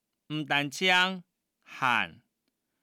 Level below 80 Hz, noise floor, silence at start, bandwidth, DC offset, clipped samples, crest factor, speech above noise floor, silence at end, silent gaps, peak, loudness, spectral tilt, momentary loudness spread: -78 dBFS; -81 dBFS; 0.3 s; 18.5 kHz; under 0.1%; under 0.1%; 20 dB; 53 dB; 0.7 s; none; -12 dBFS; -27 LUFS; -3 dB/octave; 16 LU